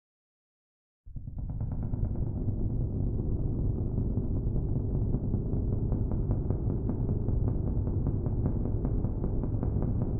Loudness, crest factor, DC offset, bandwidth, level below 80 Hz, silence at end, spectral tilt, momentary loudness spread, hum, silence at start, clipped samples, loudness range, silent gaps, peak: -32 LUFS; 16 dB; under 0.1%; 1.7 kHz; -34 dBFS; 0 s; -15 dB/octave; 3 LU; none; 1.05 s; under 0.1%; 3 LU; none; -14 dBFS